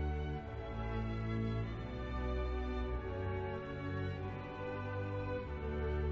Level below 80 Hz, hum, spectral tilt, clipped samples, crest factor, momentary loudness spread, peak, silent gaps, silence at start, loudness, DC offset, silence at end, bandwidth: -44 dBFS; none; -6.5 dB/octave; under 0.1%; 12 dB; 5 LU; -26 dBFS; none; 0 s; -41 LUFS; under 0.1%; 0 s; 6.6 kHz